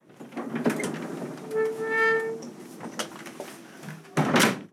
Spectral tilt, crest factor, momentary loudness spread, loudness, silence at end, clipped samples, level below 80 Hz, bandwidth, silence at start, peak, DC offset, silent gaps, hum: -4 dB/octave; 22 dB; 19 LU; -27 LUFS; 0.05 s; under 0.1%; -74 dBFS; 17.5 kHz; 0.1 s; -6 dBFS; under 0.1%; none; none